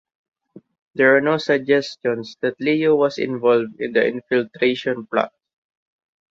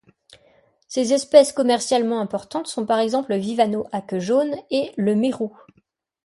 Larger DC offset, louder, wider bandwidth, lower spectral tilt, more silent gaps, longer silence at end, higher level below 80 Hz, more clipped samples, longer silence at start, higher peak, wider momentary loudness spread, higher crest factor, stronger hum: neither; about the same, -19 LUFS vs -21 LUFS; second, 7.6 kHz vs 11.5 kHz; first, -6 dB/octave vs -4.5 dB/octave; first, 0.82-0.94 s vs none; first, 1.05 s vs 0.75 s; about the same, -64 dBFS vs -66 dBFS; neither; second, 0.55 s vs 0.9 s; about the same, -2 dBFS vs 0 dBFS; second, 9 LU vs 12 LU; about the same, 18 dB vs 20 dB; neither